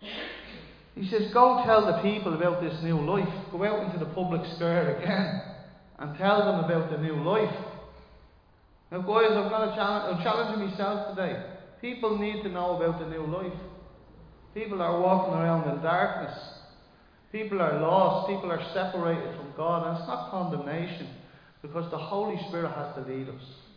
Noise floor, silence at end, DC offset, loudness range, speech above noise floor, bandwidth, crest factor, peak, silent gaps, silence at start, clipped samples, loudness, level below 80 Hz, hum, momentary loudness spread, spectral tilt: -59 dBFS; 0.2 s; under 0.1%; 7 LU; 32 dB; 5.2 kHz; 24 dB; -6 dBFS; none; 0 s; under 0.1%; -28 LUFS; -58 dBFS; none; 16 LU; -8.5 dB/octave